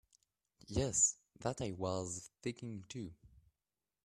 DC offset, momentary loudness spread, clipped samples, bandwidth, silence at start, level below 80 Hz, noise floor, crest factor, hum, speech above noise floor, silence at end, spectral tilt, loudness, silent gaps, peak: under 0.1%; 17 LU; under 0.1%; 13.5 kHz; 0.7 s; -62 dBFS; under -90 dBFS; 22 dB; none; over 51 dB; 0.75 s; -4 dB/octave; -38 LUFS; none; -20 dBFS